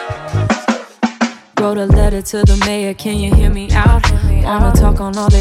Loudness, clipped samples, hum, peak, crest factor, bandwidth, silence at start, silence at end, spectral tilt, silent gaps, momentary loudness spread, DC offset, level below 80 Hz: -14 LUFS; under 0.1%; none; 0 dBFS; 12 dB; 15 kHz; 0 s; 0 s; -6 dB/octave; none; 7 LU; under 0.1%; -14 dBFS